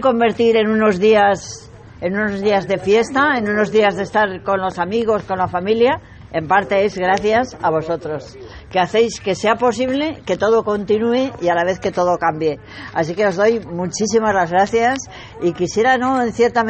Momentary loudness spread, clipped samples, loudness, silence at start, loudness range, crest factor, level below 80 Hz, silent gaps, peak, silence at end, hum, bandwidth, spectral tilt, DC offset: 9 LU; under 0.1%; -17 LUFS; 0 s; 2 LU; 16 dB; -48 dBFS; none; -2 dBFS; 0 s; none; 8.6 kHz; -5 dB/octave; under 0.1%